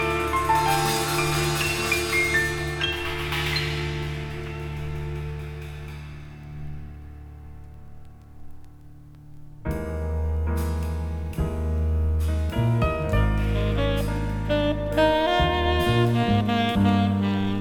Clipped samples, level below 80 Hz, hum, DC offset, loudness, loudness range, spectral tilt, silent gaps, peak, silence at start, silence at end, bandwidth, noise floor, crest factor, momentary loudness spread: under 0.1%; -32 dBFS; none; under 0.1%; -24 LUFS; 17 LU; -5.5 dB/octave; none; -8 dBFS; 0 s; 0 s; over 20 kHz; -45 dBFS; 16 dB; 17 LU